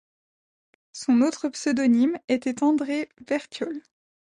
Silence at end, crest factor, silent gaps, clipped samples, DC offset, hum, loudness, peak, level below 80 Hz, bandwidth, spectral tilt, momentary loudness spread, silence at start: 0.6 s; 14 dB; 2.24-2.28 s; under 0.1%; under 0.1%; none; -24 LUFS; -10 dBFS; -70 dBFS; 10.5 kHz; -4 dB/octave; 12 LU; 0.95 s